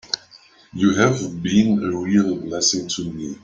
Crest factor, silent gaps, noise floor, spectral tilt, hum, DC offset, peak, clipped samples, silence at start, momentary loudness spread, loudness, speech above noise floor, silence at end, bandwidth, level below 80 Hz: 18 dB; none; -50 dBFS; -4.5 dB/octave; none; under 0.1%; -2 dBFS; under 0.1%; 0.05 s; 10 LU; -20 LUFS; 30 dB; 0.1 s; 8.8 kHz; -54 dBFS